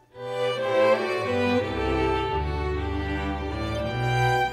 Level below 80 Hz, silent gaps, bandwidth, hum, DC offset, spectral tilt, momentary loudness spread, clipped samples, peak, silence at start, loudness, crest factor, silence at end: -36 dBFS; none; 15 kHz; none; under 0.1%; -6.5 dB/octave; 7 LU; under 0.1%; -10 dBFS; 0.15 s; -25 LUFS; 14 dB; 0 s